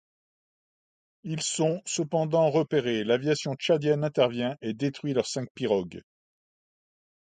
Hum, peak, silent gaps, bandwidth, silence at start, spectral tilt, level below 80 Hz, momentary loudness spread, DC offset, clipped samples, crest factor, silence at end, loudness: none; -10 dBFS; 5.50-5.55 s; 9.6 kHz; 1.25 s; -5 dB/octave; -68 dBFS; 8 LU; under 0.1%; under 0.1%; 20 dB; 1.4 s; -27 LUFS